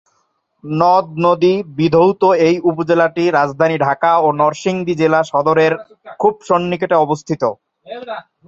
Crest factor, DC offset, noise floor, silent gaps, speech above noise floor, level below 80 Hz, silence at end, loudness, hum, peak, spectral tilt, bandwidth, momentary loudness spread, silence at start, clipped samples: 14 dB; under 0.1%; -64 dBFS; none; 50 dB; -58 dBFS; 0.25 s; -15 LUFS; none; 0 dBFS; -6.5 dB/octave; 7.8 kHz; 8 LU; 0.65 s; under 0.1%